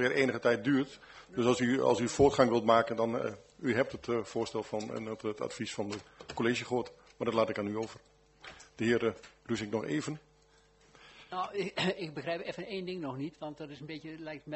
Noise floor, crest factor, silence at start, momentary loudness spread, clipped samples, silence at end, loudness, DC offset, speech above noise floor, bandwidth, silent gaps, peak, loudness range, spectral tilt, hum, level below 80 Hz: -65 dBFS; 24 dB; 0 s; 16 LU; under 0.1%; 0 s; -33 LUFS; under 0.1%; 33 dB; 8.2 kHz; none; -8 dBFS; 8 LU; -5 dB/octave; none; -64 dBFS